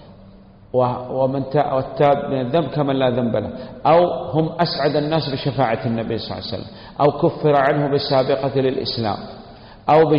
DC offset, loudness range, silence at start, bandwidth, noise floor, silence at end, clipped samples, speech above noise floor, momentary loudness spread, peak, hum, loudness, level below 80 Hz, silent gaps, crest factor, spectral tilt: under 0.1%; 1 LU; 0 s; 5.4 kHz; -44 dBFS; 0 s; under 0.1%; 26 dB; 11 LU; -6 dBFS; none; -19 LUFS; -48 dBFS; none; 14 dB; -9 dB/octave